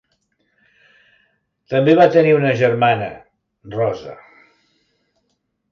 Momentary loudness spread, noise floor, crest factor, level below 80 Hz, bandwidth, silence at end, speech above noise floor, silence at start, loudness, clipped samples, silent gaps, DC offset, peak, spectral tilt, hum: 18 LU; -70 dBFS; 18 dB; -60 dBFS; 7 kHz; 1.6 s; 55 dB; 1.7 s; -15 LUFS; under 0.1%; none; under 0.1%; -2 dBFS; -7.5 dB/octave; none